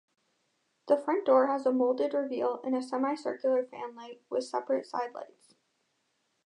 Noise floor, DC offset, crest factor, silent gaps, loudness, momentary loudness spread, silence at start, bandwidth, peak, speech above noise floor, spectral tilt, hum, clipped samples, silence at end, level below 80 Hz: -77 dBFS; under 0.1%; 20 dB; none; -30 LUFS; 16 LU; 0.85 s; 10.5 kHz; -12 dBFS; 47 dB; -5 dB/octave; none; under 0.1%; 1.2 s; -90 dBFS